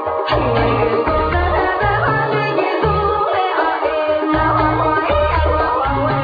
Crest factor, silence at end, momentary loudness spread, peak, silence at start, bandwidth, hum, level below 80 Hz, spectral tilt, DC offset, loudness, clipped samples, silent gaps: 14 dB; 0 s; 2 LU; -2 dBFS; 0 s; 5 kHz; none; -28 dBFS; -8.5 dB/octave; under 0.1%; -16 LUFS; under 0.1%; none